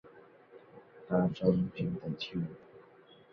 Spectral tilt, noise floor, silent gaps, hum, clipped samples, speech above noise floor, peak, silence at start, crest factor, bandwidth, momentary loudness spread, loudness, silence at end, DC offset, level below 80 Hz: -9 dB/octave; -59 dBFS; none; none; under 0.1%; 27 dB; -14 dBFS; 0.05 s; 22 dB; 6.2 kHz; 25 LU; -33 LUFS; 0.5 s; under 0.1%; -64 dBFS